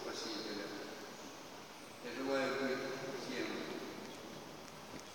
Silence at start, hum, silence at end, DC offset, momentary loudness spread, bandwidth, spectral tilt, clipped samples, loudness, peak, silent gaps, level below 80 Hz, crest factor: 0 s; none; 0 s; under 0.1%; 14 LU; 17 kHz; -3.5 dB/octave; under 0.1%; -43 LUFS; -24 dBFS; none; -80 dBFS; 20 dB